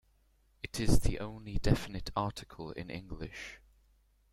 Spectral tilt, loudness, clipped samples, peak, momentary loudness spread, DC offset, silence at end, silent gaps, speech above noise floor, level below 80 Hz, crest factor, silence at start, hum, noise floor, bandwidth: -5.5 dB/octave; -36 LUFS; under 0.1%; -12 dBFS; 14 LU; under 0.1%; 0.75 s; none; 38 dB; -40 dBFS; 22 dB; 0.65 s; none; -69 dBFS; 16 kHz